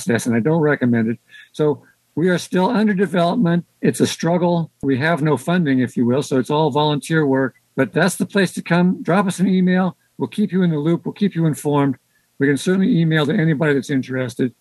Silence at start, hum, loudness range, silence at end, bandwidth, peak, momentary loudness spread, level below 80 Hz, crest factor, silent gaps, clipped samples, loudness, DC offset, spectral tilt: 0 s; none; 1 LU; 0.1 s; 12.5 kHz; -2 dBFS; 5 LU; -64 dBFS; 16 dB; none; under 0.1%; -18 LUFS; under 0.1%; -6.5 dB/octave